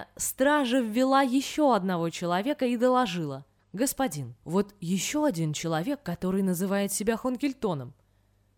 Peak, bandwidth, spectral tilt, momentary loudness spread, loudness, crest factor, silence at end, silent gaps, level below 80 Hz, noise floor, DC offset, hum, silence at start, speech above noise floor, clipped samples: -10 dBFS; 20 kHz; -5 dB/octave; 8 LU; -27 LUFS; 18 dB; 0.65 s; none; -60 dBFS; -66 dBFS; under 0.1%; none; 0 s; 39 dB; under 0.1%